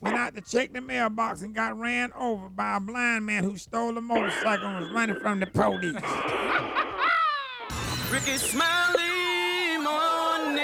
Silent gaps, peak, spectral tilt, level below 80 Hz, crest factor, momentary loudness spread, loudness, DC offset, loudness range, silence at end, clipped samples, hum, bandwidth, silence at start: none; -10 dBFS; -3.5 dB/octave; -54 dBFS; 18 dB; 7 LU; -26 LUFS; under 0.1%; 3 LU; 0 s; under 0.1%; none; over 20 kHz; 0 s